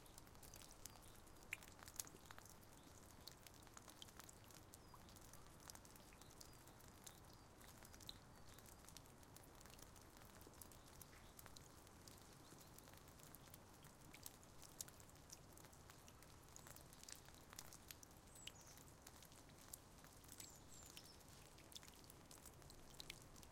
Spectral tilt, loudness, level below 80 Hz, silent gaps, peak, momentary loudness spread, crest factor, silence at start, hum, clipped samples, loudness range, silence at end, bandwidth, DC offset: -2.5 dB/octave; -61 LUFS; -72 dBFS; none; -26 dBFS; 7 LU; 36 dB; 0 s; none; under 0.1%; 4 LU; 0 s; 16.5 kHz; under 0.1%